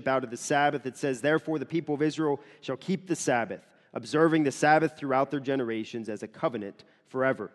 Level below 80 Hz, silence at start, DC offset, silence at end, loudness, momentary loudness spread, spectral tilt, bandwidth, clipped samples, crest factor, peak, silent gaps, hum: -74 dBFS; 0 s; under 0.1%; 0.05 s; -28 LUFS; 14 LU; -5 dB/octave; 12.5 kHz; under 0.1%; 20 dB; -8 dBFS; none; none